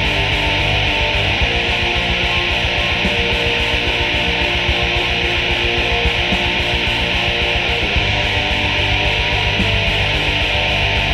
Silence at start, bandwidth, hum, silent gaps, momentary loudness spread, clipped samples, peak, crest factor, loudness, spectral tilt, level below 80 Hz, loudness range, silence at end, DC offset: 0 s; 15 kHz; none; none; 1 LU; under 0.1%; -2 dBFS; 14 dB; -15 LUFS; -4 dB/octave; -26 dBFS; 0 LU; 0 s; under 0.1%